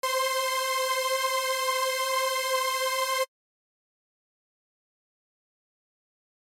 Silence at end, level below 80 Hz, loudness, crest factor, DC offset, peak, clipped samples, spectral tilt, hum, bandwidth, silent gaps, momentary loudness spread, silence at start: 3.2 s; under -90 dBFS; -26 LUFS; 16 dB; under 0.1%; -14 dBFS; under 0.1%; 6 dB/octave; none; 17 kHz; none; 1 LU; 0.05 s